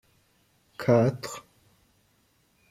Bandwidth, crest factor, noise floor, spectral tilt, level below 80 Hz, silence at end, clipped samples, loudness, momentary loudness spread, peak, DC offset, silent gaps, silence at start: 15.5 kHz; 22 dB; -67 dBFS; -7 dB/octave; -68 dBFS; 1.3 s; under 0.1%; -26 LUFS; 21 LU; -8 dBFS; under 0.1%; none; 0.8 s